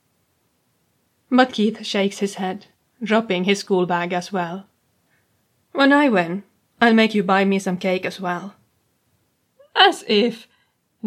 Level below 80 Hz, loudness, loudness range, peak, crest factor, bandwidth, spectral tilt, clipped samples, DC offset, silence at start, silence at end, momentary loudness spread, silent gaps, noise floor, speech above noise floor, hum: -74 dBFS; -19 LUFS; 4 LU; 0 dBFS; 20 dB; 13.5 kHz; -5 dB/octave; under 0.1%; under 0.1%; 1.3 s; 0 s; 14 LU; none; -67 dBFS; 48 dB; none